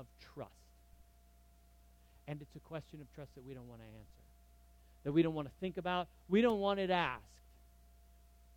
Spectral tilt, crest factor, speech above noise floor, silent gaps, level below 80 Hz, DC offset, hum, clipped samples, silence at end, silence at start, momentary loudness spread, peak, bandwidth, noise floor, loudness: -7 dB/octave; 22 dB; 27 dB; none; -64 dBFS; under 0.1%; 60 Hz at -65 dBFS; under 0.1%; 1.35 s; 0 s; 22 LU; -20 dBFS; 17 kHz; -65 dBFS; -37 LUFS